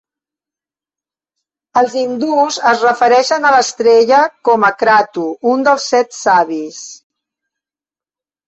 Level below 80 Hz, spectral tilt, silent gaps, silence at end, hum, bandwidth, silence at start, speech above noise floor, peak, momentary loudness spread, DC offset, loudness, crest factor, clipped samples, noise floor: -60 dBFS; -2.5 dB/octave; none; 1.5 s; none; 8.2 kHz; 1.75 s; over 78 dB; 0 dBFS; 9 LU; under 0.1%; -12 LUFS; 14 dB; under 0.1%; under -90 dBFS